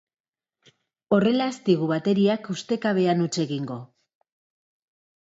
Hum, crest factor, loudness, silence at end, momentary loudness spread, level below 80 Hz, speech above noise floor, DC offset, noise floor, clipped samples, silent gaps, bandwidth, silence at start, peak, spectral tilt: none; 18 dB; -23 LUFS; 1.35 s; 8 LU; -70 dBFS; 45 dB; under 0.1%; -68 dBFS; under 0.1%; none; 8 kHz; 1.1 s; -8 dBFS; -6 dB/octave